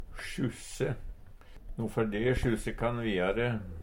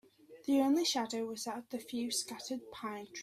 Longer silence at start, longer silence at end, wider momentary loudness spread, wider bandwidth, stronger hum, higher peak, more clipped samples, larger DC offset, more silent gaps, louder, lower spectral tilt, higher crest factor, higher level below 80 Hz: second, 0 s vs 0.3 s; about the same, 0 s vs 0 s; about the same, 11 LU vs 13 LU; about the same, 16 kHz vs 16 kHz; neither; first, -16 dBFS vs -20 dBFS; neither; neither; neither; first, -33 LUFS vs -36 LUFS; first, -6 dB/octave vs -2.5 dB/octave; about the same, 16 dB vs 16 dB; first, -44 dBFS vs -78 dBFS